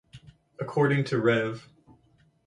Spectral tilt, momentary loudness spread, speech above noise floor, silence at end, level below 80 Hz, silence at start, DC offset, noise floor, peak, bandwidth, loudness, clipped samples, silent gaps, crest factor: -7.5 dB/octave; 13 LU; 38 dB; 0.85 s; -64 dBFS; 0.15 s; under 0.1%; -64 dBFS; -12 dBFS; 10.5 kHz; -26 LUFS; under 0.1%; none; 18 dB